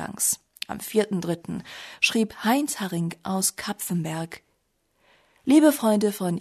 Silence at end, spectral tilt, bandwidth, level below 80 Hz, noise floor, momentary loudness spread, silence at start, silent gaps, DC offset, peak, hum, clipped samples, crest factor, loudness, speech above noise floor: 0 s; -4 dB/octave; 13.5 kHz; -64 dBFS; -71 dBFS; 16 LU; 0 s; none; under 0.1%; -6 dBFS; none; under 0.1%; 20 dB; -24 LUFS; 47 dB